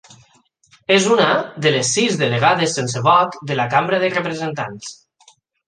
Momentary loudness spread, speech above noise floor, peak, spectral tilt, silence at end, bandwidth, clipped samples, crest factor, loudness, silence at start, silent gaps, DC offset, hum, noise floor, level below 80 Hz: 12 LU; 39 dB; -2 dBFS; -3.5 dB/octave; 0.75 s; 10 kHz; under 0.1%; 18 dB; -17 LUFS; 0.9 s; none; under 0.1%; none; -57 dBFS; -62 dBFS